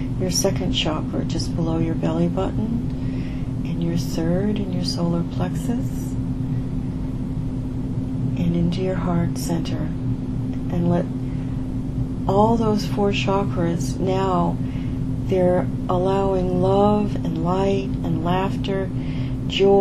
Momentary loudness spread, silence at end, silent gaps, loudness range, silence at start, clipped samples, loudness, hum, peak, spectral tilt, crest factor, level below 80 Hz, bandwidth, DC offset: 8 LU; 0 s; none; 4 LU; 0 s; under 0.1%; -22 LUFS; none; -4 dBFS; -6.5 dB/octave; 16 dB; -32 dBFS; 13.5 kHz; under 0.1%